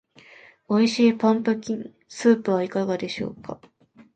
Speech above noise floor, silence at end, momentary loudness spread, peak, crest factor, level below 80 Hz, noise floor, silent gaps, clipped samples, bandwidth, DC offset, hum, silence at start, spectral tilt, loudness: 28 dB; 0.6 s; 19 LU; -6 dBFS; 18 dB; -66 dBFS; -51 dBFS; none; under 0.1%; 9 kHz; under 0.1%; none; 0.7 s; -5.5 dB/octave; -23 LUFS